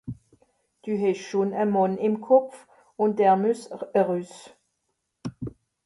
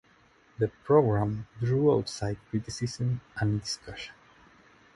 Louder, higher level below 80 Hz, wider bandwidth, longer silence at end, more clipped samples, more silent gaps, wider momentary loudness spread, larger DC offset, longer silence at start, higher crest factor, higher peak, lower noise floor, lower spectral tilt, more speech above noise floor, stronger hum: first, -24 LUFS vs -29 LUFS; second, -62 dBFS vs -54 dBFS; about the same, 11.5 kHz vs 11.5 kHz; second, 0.35 s vs 0.85 s; neither; neither; first, 19 LU vs 12 LU; neither; second, 0.05 s vs 0.6 s; about the same, 20 dB vs 20 dB; about the same, -6 dBFS vs -8 dBFS; first, -78 dBFS vs -61 dBFS; about the same, -7 dB/octave vs -6.5 dB/octave; first, 54 dB vs 34 dB; neither